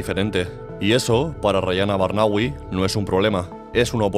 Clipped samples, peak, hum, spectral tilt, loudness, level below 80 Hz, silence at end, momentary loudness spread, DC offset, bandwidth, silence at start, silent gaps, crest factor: under 0.1%; -4 dBFS; none; -5.5 dB/octave; -21 LUFS; -42 dBFS; 0 s; 6 LU; under 0.1%; 15.5 kHz; 0 s; none; 16 dB